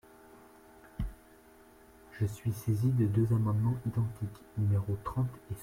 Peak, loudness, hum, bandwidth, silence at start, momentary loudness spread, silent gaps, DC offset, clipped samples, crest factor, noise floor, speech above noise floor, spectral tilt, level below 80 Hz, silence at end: -18 dBFS; -33 LUFS; none; 16 kHz; 1 s; 13 LU; none; under 0.1%; under 0.1%; 16 dB; -58 dBFS; 27 dB; -8.5 dB/octave; -52 dBFS; 0 s